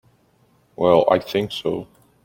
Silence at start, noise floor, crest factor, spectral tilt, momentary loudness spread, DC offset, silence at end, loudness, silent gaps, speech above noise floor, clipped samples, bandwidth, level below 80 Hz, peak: 0.8 s; -59 dBFS; 20 dB; -6.5 dB/octave; 11 LU; under 0.1%; 0.4 s; -20 LUFS; none; 41 dB; under 0.1%; 17 kHz; -56 dBFS; -2 dBFS